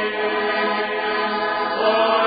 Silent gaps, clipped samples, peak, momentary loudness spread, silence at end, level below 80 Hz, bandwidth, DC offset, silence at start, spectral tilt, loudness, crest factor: none; under 0.1%; -6 dBFS; 4 LU; 0 s; -60 dBFS; 5 kHz; under 0.1%; 0 s; -8.5 dB/octave; -20 LUFS; 14 dB